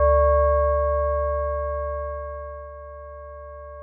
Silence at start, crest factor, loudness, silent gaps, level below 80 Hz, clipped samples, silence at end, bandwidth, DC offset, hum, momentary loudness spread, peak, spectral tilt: 0 s; 10 dB; -23 LUFS; none; -30 dBFS; under 0.1%; 0 s; 2.3 kHz; under 0.1%; none; 21 LU; -12 dBFS; -12.5 dB/octave